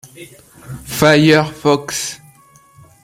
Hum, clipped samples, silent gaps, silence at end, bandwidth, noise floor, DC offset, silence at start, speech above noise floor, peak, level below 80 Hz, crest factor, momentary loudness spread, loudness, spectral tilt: none; under 0.1%; none; 0.9 s; 16.5 kHz; -47 dBFS; under 0.1%; 0.2 s; 32 dB; 0 dBFS; -48 dBFS; 16 dB; 23 LU; -14 LUFS; -4.5 dB/octave